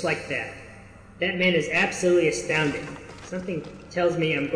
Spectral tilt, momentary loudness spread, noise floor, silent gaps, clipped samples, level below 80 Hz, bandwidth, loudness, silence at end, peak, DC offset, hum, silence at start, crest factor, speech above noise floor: -4.5 dB/octave; 15 LU; -46 dBFS; none; under 0.1%; -54 dBFS; 10.5 kHz; -24 LUFS; 0 s; -10 dBFS; under 0.1%; none; 0 s; 16 dB; 21 dB